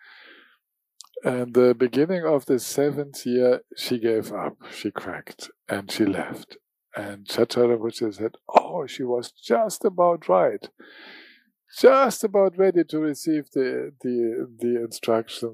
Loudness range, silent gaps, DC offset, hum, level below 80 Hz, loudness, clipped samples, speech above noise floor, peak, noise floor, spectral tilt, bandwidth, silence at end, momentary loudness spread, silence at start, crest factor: 5 LU; none; under 0.1%; none; -74 dBFS; -23 LUFS; under 0.1%; 45 dB; -4 dBFS; -68 dBFS; -5 dB/octave; 15.5 kHz; 0 s; 15 LU; 1.15 s; 20 dB